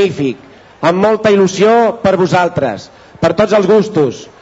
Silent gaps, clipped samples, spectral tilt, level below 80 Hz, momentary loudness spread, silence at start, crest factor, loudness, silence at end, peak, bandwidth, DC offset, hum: none; under 0.1%; -6 dB/octave; -48 dBFS; 9 LU; 0 s; 10 dB; -12 LUFS; 0.2 s; -2 dBFS; 8 kHz; under 0.1%; none